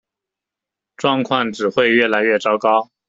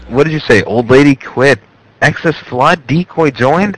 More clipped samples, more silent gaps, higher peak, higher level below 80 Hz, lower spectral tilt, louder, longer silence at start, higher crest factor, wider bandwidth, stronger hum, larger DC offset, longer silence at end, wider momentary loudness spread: second, under 0.1% vs 1%; neither; about the same, 0 dBFS vs 0 dBFS; second, -62 dBFS vs -40 dBFS; second, -5 dB/octave vs -6.5 dB/octave; second, -17 LUFS vs -11 LUFS; first, 1 s vs 0 s; first, 18 dB vs 10 dB; second, 7.8 kHz vs 11 kHz; neither; second, under 0.1% vs 0.6%; first, 0.25 s vs 0 s; about the same, 5 LU vs 7 LU